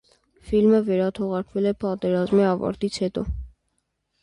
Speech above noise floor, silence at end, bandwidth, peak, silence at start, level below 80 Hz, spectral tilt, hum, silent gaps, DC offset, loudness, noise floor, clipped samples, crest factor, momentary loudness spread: 52 dB; 0.75 s; 11 kHz; -8 dBFS; 0.45 s; -42 dBFS; -7.5 dB/octave; none; none; under 0.1%; -23 LUFS; -74 dBFS; under 0.1%; 14 dB; 9 LU